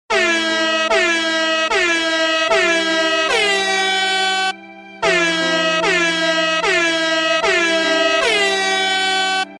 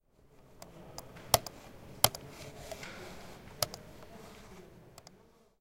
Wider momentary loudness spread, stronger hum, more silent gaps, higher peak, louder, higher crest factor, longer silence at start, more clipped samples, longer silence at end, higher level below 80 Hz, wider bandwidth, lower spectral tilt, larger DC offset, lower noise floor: second, 2 LU vs 25 LU; neither; neither; about the same, -2 dBFS vs -2 dBFS; first, -15 LUFS vs -33 LUFS; second, 14 dB vs 38 dB; about the same, 0.1 s vs 0.15 s; neither; about the same, 0 s vs 0.1 s; about the same, -54 dBFS vs -58 dBFS; second, 13.5 kHz vs 16.5 kHz; about the same, -1.5 dB/octave vs -2 dB/octave; neither; second, -37 dBFS vs -63 dBFS